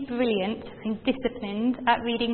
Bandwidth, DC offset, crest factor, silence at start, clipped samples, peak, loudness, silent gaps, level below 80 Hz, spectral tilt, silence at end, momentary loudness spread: 4.4 kHz; under 0.1%; 20 dB; 0 s; under 0.1%; -6 dBFS; -27 LUFS; none; -54 dBFS; -9.5 dB/octave; 0 s; 8 LU